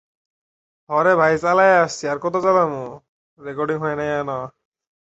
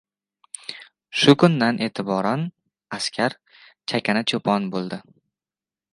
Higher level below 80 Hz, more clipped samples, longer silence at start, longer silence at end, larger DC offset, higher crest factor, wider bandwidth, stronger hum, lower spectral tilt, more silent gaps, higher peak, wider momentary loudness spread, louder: first, -58 dBFS vs -68 dBFS; neither; first, 0.9 s vs 0.7 s; second, 0.65 s vs 0.95 s; neither; about the same, 18 dB vs 22 dB; second, 8.2 kHz vs 11.5 kHz; neither; about the same, -5.5 dB/octave vs -5 dB/octave; first, 3.09-3.37 s vs none; about the same, -2 dBFS vs 0 dBFS; about the same, 17 LU vs 19 LU; about the same, -19 LUFS vs -21 LUFS